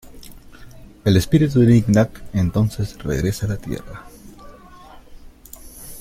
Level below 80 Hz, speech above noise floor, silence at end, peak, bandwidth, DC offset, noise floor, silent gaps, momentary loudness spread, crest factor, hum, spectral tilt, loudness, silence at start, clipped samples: -40 dBFS; 25 dB; 0 s; -2 dBFS; 16.5 kHz; under 0.1%; -42 dBFS; none; 24 LU; 18 dB; none; -7 dB/octave; -19 LUFS; 0.05 s; under 0.1%